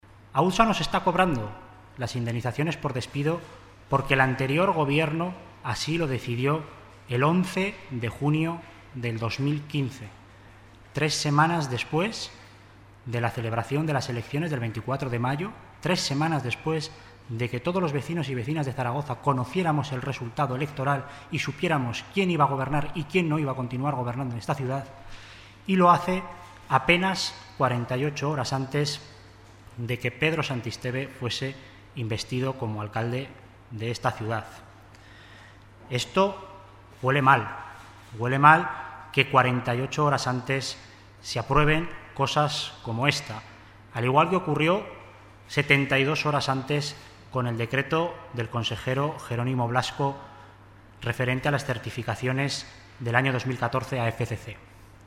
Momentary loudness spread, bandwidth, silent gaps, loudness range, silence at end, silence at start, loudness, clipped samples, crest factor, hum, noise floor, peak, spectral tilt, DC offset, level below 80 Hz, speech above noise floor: 15 LU; 15 kHz; none; 7 LU; 0.05 s; 0.25 s; -26 LUFS; under 0.1%; 26 dB; none; -51 dBFS; -2 dBFS; -5.5 dB/octave; under 0.1%; -52 dBFS; 25 dB